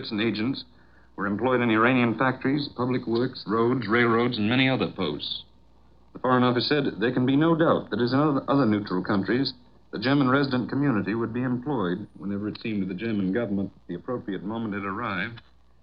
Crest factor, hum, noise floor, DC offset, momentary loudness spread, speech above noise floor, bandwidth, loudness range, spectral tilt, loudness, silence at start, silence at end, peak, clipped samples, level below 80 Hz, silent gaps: 18 dB; none; -58 dBFS; 0.2%; 10 LU; 33 dB; 5.4 kHz; 6 LU; -9.5 dB/octave; -25 LUFS; 0 s; 0.45 s; -6 dBFS; under 0.1%; -60 dBFS; none